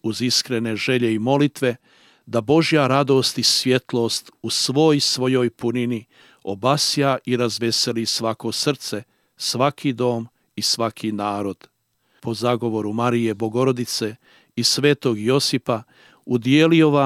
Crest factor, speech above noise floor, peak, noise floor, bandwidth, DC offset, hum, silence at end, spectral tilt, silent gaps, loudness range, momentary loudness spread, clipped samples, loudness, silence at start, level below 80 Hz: 18 dB; 45 dB; -2 dBFS; -65 dBFS; 16 kHz; under 0.1%; none; 0 s; -4.5 dB/octave; none; 5 LU; 11 LU; under 0.1%; -20 LUFS; 0.05 s; -68 dBFS